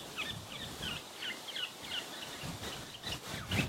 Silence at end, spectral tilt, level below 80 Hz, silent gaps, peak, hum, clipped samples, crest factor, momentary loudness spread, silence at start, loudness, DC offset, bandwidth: 0 s; -3 dB/octave; -58 dBFS; none; -18 dBFS; none; under 0.1%; 22 dB; 4 LU; 0 s; -40 LUFS; under 0.1%; 16.5 kHz